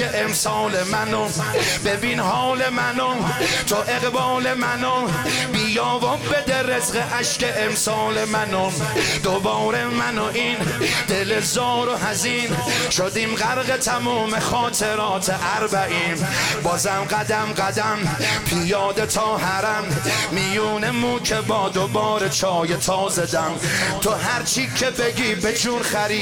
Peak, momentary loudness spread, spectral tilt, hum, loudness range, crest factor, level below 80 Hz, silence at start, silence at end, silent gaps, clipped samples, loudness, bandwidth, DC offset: -10 dBFS; 2 LU; -3 dB/octave; none; 0 LU; 10 dB; -48 dBFS; 0 s; 0 s; none; under 0.1%; -20 LUFS; 17.5 kHz; under 0.1%